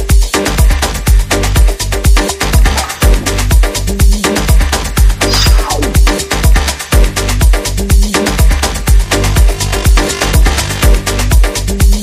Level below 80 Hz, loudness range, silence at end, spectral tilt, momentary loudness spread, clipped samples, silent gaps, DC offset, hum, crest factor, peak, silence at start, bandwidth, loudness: -10 dBFS; 1 LU; 0 s; -4 dB/octave; 3 LU; under 0.1%; none; under 0.1%; none; 8 dB; 0 dBFS; 0 s; 16 kHz; -11 LUFS